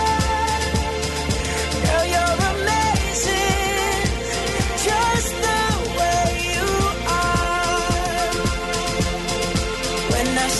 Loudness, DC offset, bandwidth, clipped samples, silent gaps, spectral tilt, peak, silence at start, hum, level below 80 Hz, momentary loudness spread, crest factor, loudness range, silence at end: -20 LUFS; under 0.1%; 12.5 kHz; under 0.1%; none; -3.5 dB/octave; -6 dBFS; 0 s; none; -30 dBFS; 4 LU; 14 dB; 1 LU; 0 s